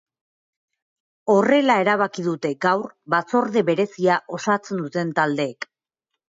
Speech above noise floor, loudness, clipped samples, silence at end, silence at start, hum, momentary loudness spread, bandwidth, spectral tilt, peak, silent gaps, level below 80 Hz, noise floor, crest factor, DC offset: 62 dB; -21 LUFS; under 0.1%; 0.65 s; 1.25 s; none; 9 LU; 7.8 kHz; -5.5 dB/octave; -6 dBFS; none; -72 dBFS; -82 dBFS; 16 dB; under 0.1%